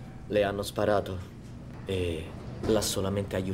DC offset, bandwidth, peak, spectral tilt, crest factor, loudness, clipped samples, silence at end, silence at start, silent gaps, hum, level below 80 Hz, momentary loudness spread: under 0.1%; 16 kHz; -12 dBFS; -5 dB/octave; 18 dB; -30 LUFS; under 0.1%; 0 s; 0 s; none; none; -48 dBFS; 14 LU